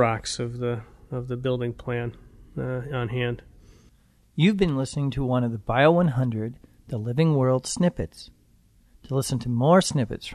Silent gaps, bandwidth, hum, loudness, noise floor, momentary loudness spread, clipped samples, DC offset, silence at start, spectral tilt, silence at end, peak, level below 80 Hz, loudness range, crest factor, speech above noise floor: none; 13.5 kHz; none; -25 LUFS; -59 dBFS; 16 LU; under 0.1%; under 0.1%; 0 s; -6 dB/octave; 0 s; -6 dBFS; -48 dBFS; 7 LU; 18 dB; 35 dB